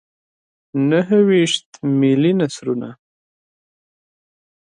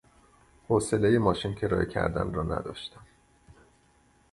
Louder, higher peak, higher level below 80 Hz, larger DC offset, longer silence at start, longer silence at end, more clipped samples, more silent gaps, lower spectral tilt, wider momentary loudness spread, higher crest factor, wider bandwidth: first, -17 LUFS vs -28 LUFS; first, -4 dBFS vs -8 dBFS; second, -68 dBFS vs -46 dBFS; neither; about the same, 0.75 s vs 0.7 s; first, 1.8 s vs 1.3 s; neither; first, 1.66-1.72 s vs none; about the same, -6 dB/octave vs -6 dB/octave; about the same, 11 LU vs 13 LU; second, 16 dB vs 22 dB; second, 10 kHz vs 11.5 kHz